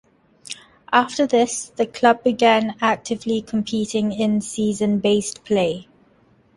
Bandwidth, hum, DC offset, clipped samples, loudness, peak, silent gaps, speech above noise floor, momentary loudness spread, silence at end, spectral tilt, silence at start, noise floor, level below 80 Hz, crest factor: 11.5 kHz; none; under 0.1%; under 0.1%; -20 LUFS; -2 dBFS; none; 37 dB; 8 LU; 0.75 s; -4.5 dB/octave; 0.5 s; -56 dBFS; -58 dBFS; 18 dB